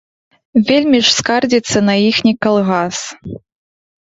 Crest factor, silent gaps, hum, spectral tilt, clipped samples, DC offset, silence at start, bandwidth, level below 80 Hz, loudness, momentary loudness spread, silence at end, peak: 14 dB; none; none; -4 dB/octave; under 0.1%; under 0.1%; 0.55 s; 8 kHz; -50 dBFS; -13 LUFS; 16 LU; 0.75 s; 0 dBFS